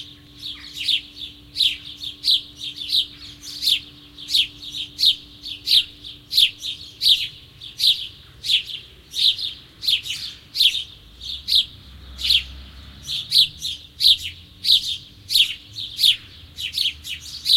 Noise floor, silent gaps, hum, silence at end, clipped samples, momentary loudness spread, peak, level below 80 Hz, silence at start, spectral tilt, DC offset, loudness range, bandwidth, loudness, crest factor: -41 dBFS; none; none; 0 s; under 0.1%; 17 LU; -2 dBFS; -50 dBFS; 0 s; 0.5 dB/octave; under 0.1%; 3 LU; 16.5 kHz; -19 LUFS; 20 dB